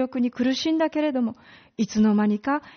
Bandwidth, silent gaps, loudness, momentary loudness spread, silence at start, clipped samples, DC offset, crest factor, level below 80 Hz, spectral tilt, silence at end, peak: 6.6 kHz; none; -23 LUFS; 9 LU; 0 s; under 0.1%; under 0.1%; 12 dB; -60 dBFS; -5 dB/octave; 0.05 s; -12 dBFS